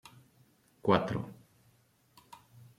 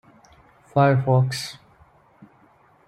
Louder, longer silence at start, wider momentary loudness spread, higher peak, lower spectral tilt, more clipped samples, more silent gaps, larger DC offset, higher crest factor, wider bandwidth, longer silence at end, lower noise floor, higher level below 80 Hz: second, -32 LUFS vs -21 LUFS; about the same, 0.85 s vs 0.75 s; first, 27 LU vs 13 LU; second, -10 dBFS vs -6 dBFS; about the same, -7 dB/octave vs -6.5 dB/octave; neither; neither; neither; first, 26 dB vs 20 dB; first, 15.5 kHz vs 13 kHz; about the same, 1.45 s vs 1.35 s; first, -68 dBFS vs -56 dBFS; about the same, -66 dBFS vs -62 dBFS